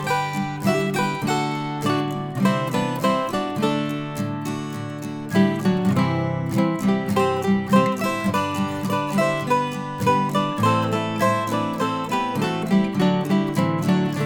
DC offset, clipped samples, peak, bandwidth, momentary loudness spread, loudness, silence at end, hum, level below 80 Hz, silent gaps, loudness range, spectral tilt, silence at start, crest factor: under 0.1%; under 0.1%; -6 dBFS; 19.5 kHz; 6 LU; -22 LUFS; 0 s; none; -56 dBFS; none; 2 LU; -6 dB/octave; 0 s; 16 dB